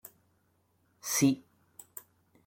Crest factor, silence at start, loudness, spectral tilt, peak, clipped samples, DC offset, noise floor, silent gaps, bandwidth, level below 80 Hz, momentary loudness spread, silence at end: 22 dB; 1.05 s; -30 LUFS; -4 dB/octave; -14 dBFS; under 0.1%; under 0.1%; -72 dBFS; none; 17 kHz; -74 dBFS; 22 LU; 1.05 s